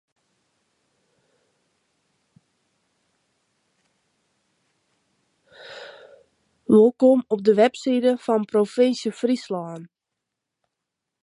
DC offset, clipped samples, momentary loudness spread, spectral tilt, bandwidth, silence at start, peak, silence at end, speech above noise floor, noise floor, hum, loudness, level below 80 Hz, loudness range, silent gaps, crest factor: under 0.1%; under 0.1%; 23 LU; -6 dB/octave; 11 kHz; 5.65 s; -4 dBFS; 1.4 s; 64 dB; -83 dBFS; none; -20 LUFS; -74 dBFS; 5 LU; none; 20 dB